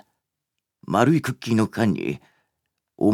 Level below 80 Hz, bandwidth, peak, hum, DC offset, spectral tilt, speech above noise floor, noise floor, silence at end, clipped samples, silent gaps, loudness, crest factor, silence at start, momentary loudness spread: -62 dBFS; 16 kHz; -2 dBFS; none; under 0.1%; -7 dB/octave; 61 dB; -82 dBFS; 0 s; under 0.1%; none; -22 LUFS; 22 dB; 0.9 s; 10 LU